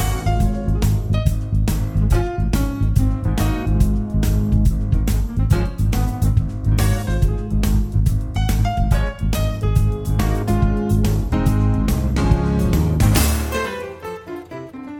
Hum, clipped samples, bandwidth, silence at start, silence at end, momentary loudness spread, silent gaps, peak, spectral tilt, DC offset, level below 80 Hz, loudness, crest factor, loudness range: none; under 0.1%; 18.5 kHz; 0 s; 0 s; 4 LU; none; -2 dBFS; -6.5 dB/octave; under 0.1%; -20 dBFS; -19 LUFS; 16 dB; 2 LU